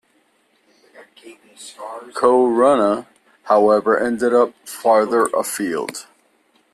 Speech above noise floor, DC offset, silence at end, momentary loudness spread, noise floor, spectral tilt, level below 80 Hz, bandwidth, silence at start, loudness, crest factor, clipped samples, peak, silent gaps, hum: 44 dB; under 0.1%; 0.7 s; 19 LU; -61 dBFS; -4.5 dB/octave; -64 dBFS; 14 kHz; 1 s; -17 LUFS; 16 dB; under 0.1%; -2 dBFS; none; none